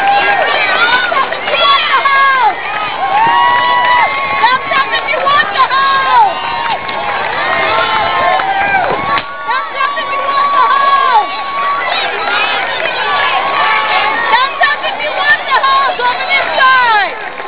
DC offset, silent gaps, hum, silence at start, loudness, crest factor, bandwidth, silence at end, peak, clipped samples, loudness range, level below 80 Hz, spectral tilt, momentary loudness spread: 2%; none; none; 0 s; -11 LUFS; 12 dB; 4 kHz; 0 s; 0 dBFS; under 0.1%; 2 LU; -48 dBFS; -5.5 dB/octave; 7 LU